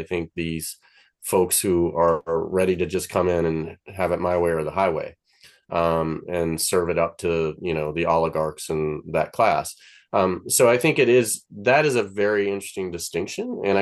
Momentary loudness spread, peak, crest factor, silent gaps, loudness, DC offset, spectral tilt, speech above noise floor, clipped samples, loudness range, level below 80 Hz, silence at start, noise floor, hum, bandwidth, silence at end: 10 LU; -4 dBFS; 18 dB; none; -22 LUFS; under 0.1%; -4.5 dB/octave; 33 dB; under 0.1%; 4 LU; -50 dBFS; 0 s; -55 dBFS; none; 13 kHz; 0 s